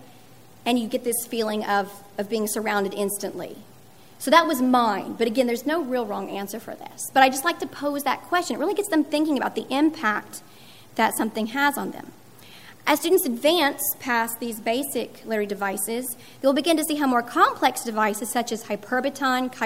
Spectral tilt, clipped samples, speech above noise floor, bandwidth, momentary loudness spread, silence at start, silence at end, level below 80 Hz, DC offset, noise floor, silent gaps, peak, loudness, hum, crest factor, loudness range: -3 dB/octave; under 0.1%; 27 dB; 16 kHz; 12 LU; 0 s; 0 s; -70 dBFS; 0.3%; -50 dBFS; none; -2 dBFS; -24 LUFS; none; 22 dB; 3 LU